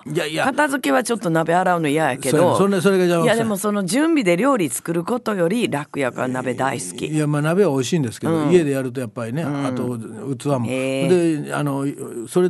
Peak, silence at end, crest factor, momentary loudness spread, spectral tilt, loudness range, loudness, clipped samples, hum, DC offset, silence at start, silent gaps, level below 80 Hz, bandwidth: -2 dBFS; 0 s; 18 dB; 8 LU; -5.5 dB/octave; 4 LU; -20 LUFS; under 0.1%; none; under 0.1%; 0.05 s; none; -62 dBFS; 12.5 kHz